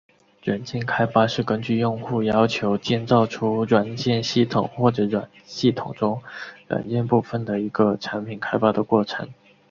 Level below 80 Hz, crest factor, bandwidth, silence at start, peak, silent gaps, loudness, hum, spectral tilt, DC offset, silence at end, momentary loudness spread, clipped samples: -56 dBFS; 20 dB; 7.4 kHz; 0.45 s; -2 dBFS; none; -22 LUFS; none; -6.5 dB/octave; under 0.1%; 0.35 s; 9 LU; under 0.1%